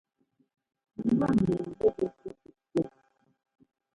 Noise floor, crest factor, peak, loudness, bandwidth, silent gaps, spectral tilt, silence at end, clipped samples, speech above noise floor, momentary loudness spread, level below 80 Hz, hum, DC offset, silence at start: -69 dBFS; 20 dB; -12 dBFS; -29 LUFS; 11 kHz; none; -9 dB/octave; 1.05 s; under 0.1%; 42 dB; 20 LU; -58 dBFS; none; under 0.1%; 1 s